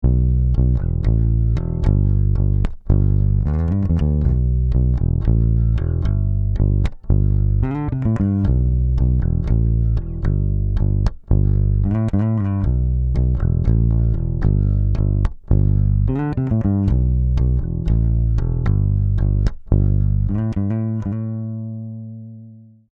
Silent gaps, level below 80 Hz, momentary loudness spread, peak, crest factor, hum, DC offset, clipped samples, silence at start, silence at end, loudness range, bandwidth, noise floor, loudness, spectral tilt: none; -20 dBFS; 4 LU; 0 dBFS; 16 dB; none; under 0.1%; under 0.1%; 0 s; 0.35 s; 1 LU; 3.9 kHz; -42 dBFS; -19 LUFS; -11 dB/octave